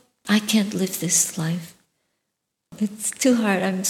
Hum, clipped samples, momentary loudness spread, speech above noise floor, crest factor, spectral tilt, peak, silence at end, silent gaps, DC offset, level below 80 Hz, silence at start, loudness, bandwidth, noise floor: none; under 0.1%; 9 LU; 57 dB; 16 dB; -3.5 dB/octave; -6 dBFS; 0 s; none; under 0.1%; -70 dBFS; 0.25 s; -22 LUFS; 17.5 kHz; -79 dBFS